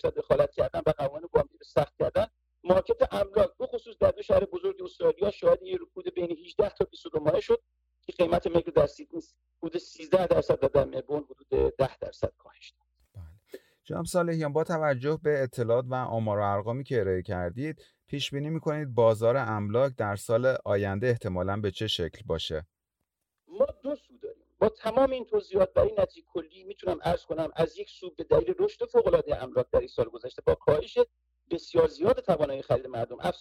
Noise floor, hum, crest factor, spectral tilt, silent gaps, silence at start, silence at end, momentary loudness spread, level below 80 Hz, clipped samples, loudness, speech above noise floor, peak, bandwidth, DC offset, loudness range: -84 dBFS; none; 20 dB; -6.5 dB/octave; none; 0.05 s; 0 s; 12 LU; -50 dBFS; under 0.1%; -28 LUFS; 57 dB; -8 dBFS; 15 kHz; under 0.1%; 4 LU